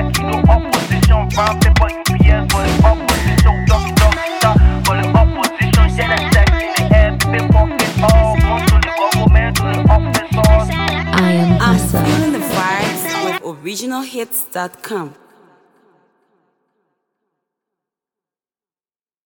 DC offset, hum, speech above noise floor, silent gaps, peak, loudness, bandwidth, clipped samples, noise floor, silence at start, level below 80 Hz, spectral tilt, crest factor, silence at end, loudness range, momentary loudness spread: under 0.1%; none; over 71 dB; none; 0 dBFS; -14 LUFS; 19 kHz; under 0.1%; under -90 dBFS; 0 s; -18 dBFS; -5.5 dB/octave; 14 dB; 4.15 s; 12 LU; 8 LU